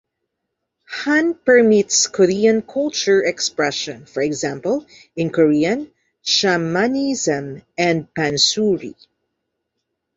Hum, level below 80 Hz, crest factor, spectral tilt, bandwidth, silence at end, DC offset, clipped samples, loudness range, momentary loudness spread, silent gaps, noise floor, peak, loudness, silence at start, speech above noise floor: none; -60 dBFS; 18 dB; -3.5 dB/octave; 8 kHz; 1.25 s; under 0.1%; under 0.1%; 4 LU; 11 LU; none; -77 dBFS; -2 dBFS; -18 LUFS; 0.9 s; 60 dB